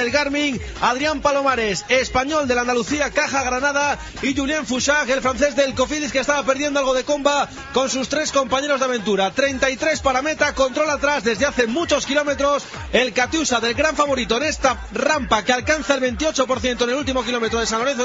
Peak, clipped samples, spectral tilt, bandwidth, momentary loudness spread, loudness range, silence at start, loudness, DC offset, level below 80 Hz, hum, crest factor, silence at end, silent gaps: -2 dBFS; under 0.1%; -2 dB/octave; 7.8 kHz; 3 LU; 1 LU; 0 s; -19 LUFS; under 0.1%; -40 dBFS; none; 18 dB; 0 s; none